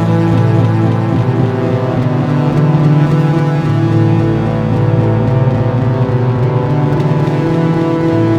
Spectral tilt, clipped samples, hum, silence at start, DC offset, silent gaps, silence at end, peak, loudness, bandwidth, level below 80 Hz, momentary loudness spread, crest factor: -9.5 dB/octave; under 0.1%; none; 0 s; under 0.1%; none; 0 s; 0 dBFS; -12 LUFS; 7.4 kHz; -36 dBFS; 3 LU; 12 dB